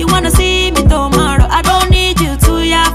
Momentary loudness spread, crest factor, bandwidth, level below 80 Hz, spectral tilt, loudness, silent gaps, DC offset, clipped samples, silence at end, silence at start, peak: 2 LU; 10 dB; 15.5 kHz; -14 dBFS; -4.5 dB/octave; -11 LUFS; none; under 0.1%; under 0.1%; 0 s; 0 s; 0 dBFS